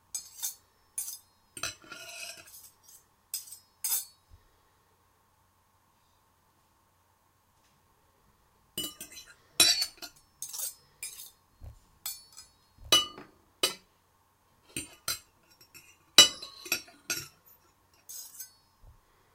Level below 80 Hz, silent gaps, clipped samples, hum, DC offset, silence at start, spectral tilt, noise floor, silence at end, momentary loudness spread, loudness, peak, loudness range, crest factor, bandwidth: -64 dBFS; none; under 0.1%; none; under 0.1%; 0.15 s; 0.5 dB/octave; -69 dBFS; 0.9 s; 25 LU; -29 LUFS; 0 dBFS; 14 LU; 36 dB; 16.5 kHz